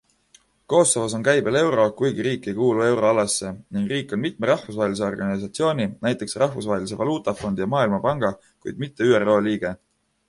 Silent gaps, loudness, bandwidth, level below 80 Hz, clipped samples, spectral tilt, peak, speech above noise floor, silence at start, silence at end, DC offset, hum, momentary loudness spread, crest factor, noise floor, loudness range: none; -22 LUFS; 11.5 kHz; -56 dBFS; under 0.1%; -4.5 dB/octave; -4 dBFS; 36 dB; 0.7 s; 0.55 s; under 0.1%; none; 8 LU; 18 dB; -58 dBFS; 4 LU